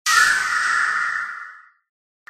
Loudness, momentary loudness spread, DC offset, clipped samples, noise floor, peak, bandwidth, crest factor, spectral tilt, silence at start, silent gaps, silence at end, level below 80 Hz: -18 LUFS; 18 LU; under 0.1%; under 0.1%; -41 dBFS; -4 dBFS; 15.5 kHz; 18 dB; 2.5 dB/octave; 0.05 s; none; 0.7 s; -62 dBFS